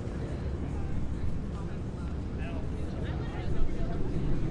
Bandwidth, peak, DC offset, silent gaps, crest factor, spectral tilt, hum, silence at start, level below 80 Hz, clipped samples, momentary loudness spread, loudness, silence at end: 8 kHz; -14 dBFS; under 0.1%; none; 16 dB; -8 dB/octave; none; 0 s; -36 dBFS; under 0.1%; 3 LU; -35 LUFS; 0 s